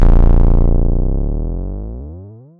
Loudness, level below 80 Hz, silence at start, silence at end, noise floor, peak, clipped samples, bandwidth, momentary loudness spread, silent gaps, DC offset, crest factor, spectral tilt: -17 LUFS; -12 dBFS; 0 s; 0.25 s; -34 dBFS; -2 dBFS; under 0.1%; 2.2 kHz; 17 LU; none; under 0.1%; 10 dB; -11.5 dB/octave